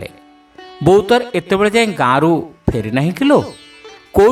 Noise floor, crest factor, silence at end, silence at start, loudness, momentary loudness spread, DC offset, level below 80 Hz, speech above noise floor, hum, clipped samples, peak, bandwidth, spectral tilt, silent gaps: -44 dBFS; 14 dB; 0 s; 0 s; -14 LUFS; 8 LU; under 0.1%; -38 dBFS; 31 dB; none; under 0.1%; 0 dBFS; 15 kHz; -6 dB/octave; none